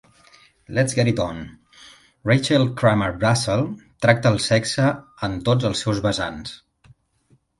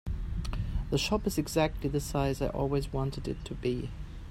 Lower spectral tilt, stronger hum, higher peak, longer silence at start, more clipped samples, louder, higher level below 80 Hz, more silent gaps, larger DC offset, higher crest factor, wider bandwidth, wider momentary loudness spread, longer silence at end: about the same, -5.5 dB/octave vs -5.5 dB/octave; neither; first, 0 dBFS vs -14 dBFS; first, 0.7 s vs 0.05 s; neither; first, -21 LUFS vs -32 LUFS; second, -48 dBFS vs -38 dBFS; neither; neither; about the same, 22 dB vs 18 dB; second, 11.5 kHz vs 16 kHz; first, 11 LU vs 8 LU; first, 1.05 s vs 0 s